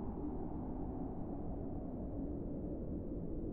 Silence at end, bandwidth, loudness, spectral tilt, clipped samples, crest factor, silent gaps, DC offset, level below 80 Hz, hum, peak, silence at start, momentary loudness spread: 0 s; 2.6 kHz; -44 LUFS; -13 dB/octave; under 0.1%; 12 dB; none; under 0.1%; -48 dBFS; none; -30 dBFS; 0 s; 1 LU